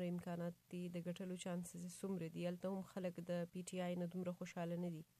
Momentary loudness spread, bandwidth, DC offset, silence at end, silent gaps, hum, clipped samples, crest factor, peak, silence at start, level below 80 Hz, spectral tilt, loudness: 4 LU; 14.5 kHz; under 0.1%; 0.15 s; none; none; under 0.1%; 14 dB; -34 dBFS; 0 s; -82 dBFS; -6.5 dB/octave; -47 LUFS